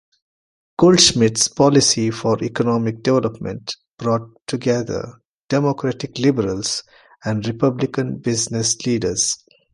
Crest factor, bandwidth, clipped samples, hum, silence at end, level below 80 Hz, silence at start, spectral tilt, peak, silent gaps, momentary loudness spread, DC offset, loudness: 20 dB; 11.5 kHz; under 0.1%; none; 0.4 s; -50 dBFS; 0.8 s; -4 dB/octave; 0 dBFS; 3.88-3.97 s, 5.25-5.45 s; 14 LU; under 0.1%; -18 LUFS